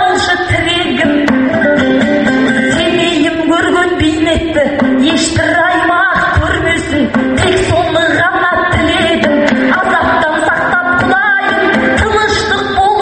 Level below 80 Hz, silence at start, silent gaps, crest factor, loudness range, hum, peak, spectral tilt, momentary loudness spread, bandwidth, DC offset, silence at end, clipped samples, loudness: -30 dBFS; 0 s; none; 10 dB; 1 LU; none; 0 dBFS; -4.5 dB/octave; 2 LU; 8.8 kHz; under 0.1%; 0 s; under 0.1%; -10 LUFS